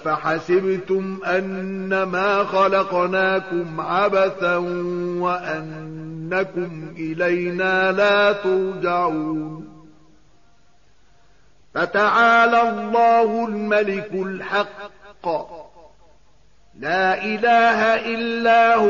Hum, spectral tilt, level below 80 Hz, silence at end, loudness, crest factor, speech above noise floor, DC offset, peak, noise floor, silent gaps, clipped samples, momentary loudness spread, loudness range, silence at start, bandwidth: none; -3 dB/octave; -58 dBFS; 0 s; -20 LUFS; 14 dB; 39 dB; 0.3%; -6 dBFS; -59 dBFS; none; under 0.1%; 14 LU; 7 LU; 0 s; 7.2 kHz